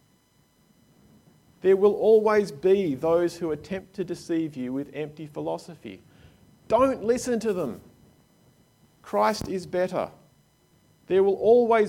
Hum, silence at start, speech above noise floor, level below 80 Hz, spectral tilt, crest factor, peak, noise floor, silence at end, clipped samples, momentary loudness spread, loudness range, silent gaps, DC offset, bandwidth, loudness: none; 1.65 s; 40 dB; -60 dBFS; -6 dB/octave; 18 dB; -8 dBFS; -63 dBFS; 0 s; under 0.1%; 16 LU; 7 LU; none; under 0.1%; 16 kHz; -25 LUFS